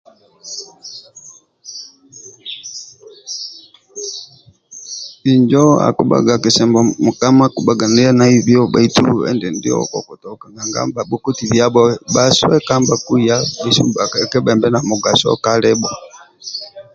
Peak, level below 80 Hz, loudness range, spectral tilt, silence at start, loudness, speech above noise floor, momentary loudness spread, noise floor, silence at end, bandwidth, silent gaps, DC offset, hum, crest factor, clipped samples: 0 dBFS; -50 dBFS; 17 LU; -5 dB/octave; 0.45 s; -13 LUFS; 30 dB; 20 LU; -44 dBFS; 0.15 s; 7.8 kHz; none; under 0.1%; none; 14 dB; under 0.1%